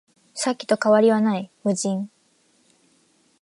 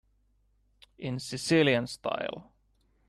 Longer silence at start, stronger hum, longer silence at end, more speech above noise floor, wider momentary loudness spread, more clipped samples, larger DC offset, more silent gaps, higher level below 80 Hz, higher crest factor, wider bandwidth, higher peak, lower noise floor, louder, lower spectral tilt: second, 0.35 s vs 1 s; neither; first, 1.35 s vs 0.65 s; about the same, 42 dB vs 40 dB; about the same, 13 LU vs 15 LU; neither; neither; neither; second, -76 dBFS vs -64 dBFS; about the same, 18 dB vs 20 dB; second, 11.5 kHz vs 13 kHz; first, -6 dBFS vs -12 dBFS; second, -62 dBFS vs -69 dBFS; first, -21 LUFS vs -29 LUFS; about the same, -5 dB/octave vs -5 dB/octave